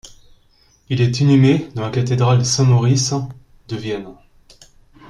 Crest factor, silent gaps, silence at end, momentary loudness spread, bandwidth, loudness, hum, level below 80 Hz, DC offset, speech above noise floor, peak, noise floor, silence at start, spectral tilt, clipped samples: 14 dB; none; 0.95 s; 14 LU; 10.5 kHz; -16 LUFS; none; -48 dBFS; under 0.1%; 39 dB; -2 dBFS; -55 dBFS; 0.05 s; -6 dB/octave; under 0.1%